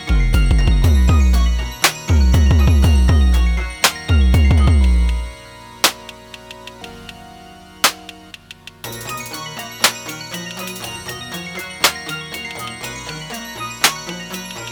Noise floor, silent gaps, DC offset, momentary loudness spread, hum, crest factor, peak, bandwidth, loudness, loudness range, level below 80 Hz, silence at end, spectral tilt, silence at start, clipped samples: -39 dBFS; none; under 0.1%; 21 LU; none; 16 dB; 0 dBFS; over 20 kHz; -17 LUFS; 9 LU; -18 dBFS; 0 s; -4 dB/octave; 0 s; under 0.1%